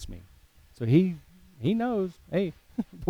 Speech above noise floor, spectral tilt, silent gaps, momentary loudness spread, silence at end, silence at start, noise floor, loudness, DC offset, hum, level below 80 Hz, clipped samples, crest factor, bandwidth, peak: 30 dB; -8.5 dB/octave; none; 18 LU; 0 s; 0 s; -56 dBFS; -28 LUFS; under 0.1%; none; -52 dBFS; under 0.1%; 20 dB; 13.5 kHz; -10 dBFS